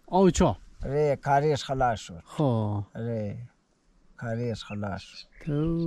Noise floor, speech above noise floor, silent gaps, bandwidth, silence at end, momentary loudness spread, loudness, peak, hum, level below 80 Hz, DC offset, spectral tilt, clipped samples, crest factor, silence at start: -65 dBFS; 38 dB; none; 12 kHz; 0 s; 15 LU; -28 LUFS; -10 dBFS; none; -46 dBFS; under 0.1%; -6.5 dB/octave; under 0.1%; 18 dB; 0.1 s